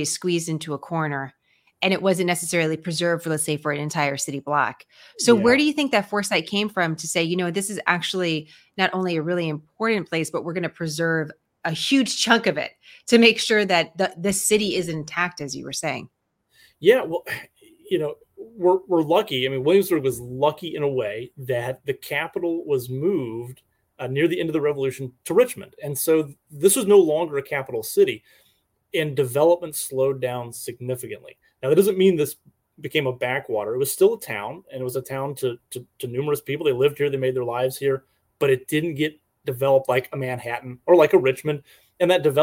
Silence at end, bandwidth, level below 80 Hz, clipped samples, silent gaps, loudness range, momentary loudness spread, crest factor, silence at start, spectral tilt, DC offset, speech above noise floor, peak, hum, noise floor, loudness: 0 s; 17 kHz; -64 dBFS; under 0.1%; none; 5 LU; 12 LU; 22 dB; 0 s; -4 dB/octave; under 0.1%; 43 dB; -2 dBFS; none; -65 dBFS; -22 LUFS